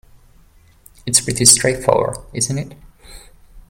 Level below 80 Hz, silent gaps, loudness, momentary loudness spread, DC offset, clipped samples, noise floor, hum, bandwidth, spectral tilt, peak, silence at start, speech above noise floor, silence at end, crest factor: -42 dBFS; none; -14 LUFS; 17 LU; under 0.1%; under 0.1%; -49 dBFS; none; 17 kHz; -2.5 dB/octave; 0 dBFS; 1.05 s; 33 dB; 0.1 s; 20 dB